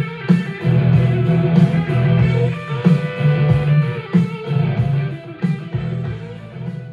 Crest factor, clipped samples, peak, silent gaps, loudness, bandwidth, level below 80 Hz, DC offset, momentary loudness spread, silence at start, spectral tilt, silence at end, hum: 16 dB; under 0.1%; -2 dBFS; none; -17 LUFS; 5.2 kHz; -42 dBFS; under 0.1%; 11 LU; 0 s; -9.5 dB/octave; 0 s; none